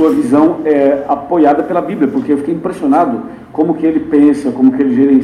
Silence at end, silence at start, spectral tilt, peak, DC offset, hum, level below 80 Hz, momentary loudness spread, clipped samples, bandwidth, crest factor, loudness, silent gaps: 0 s; 0 s; -8 dB/octave; 0 dBFS; under 0.1%; none; -50 dBFS; 6 LU; under 0.1%; 10 kHz; 12 dB; -12 LUFS; none